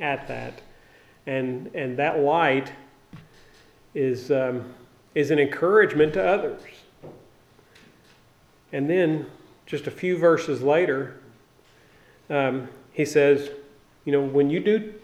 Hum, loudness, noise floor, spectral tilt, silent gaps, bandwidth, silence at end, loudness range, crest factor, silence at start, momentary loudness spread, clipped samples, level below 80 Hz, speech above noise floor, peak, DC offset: none; -23 LUFS; -57 dBFS; -6.5 dB/octave; none; 13 kHz; 0.05 s; 5 LU; 20 dB; 0 s; 17 LU; under 0.1%; -58 dBFS; 35 dB; -6 dBFS; under 0.1%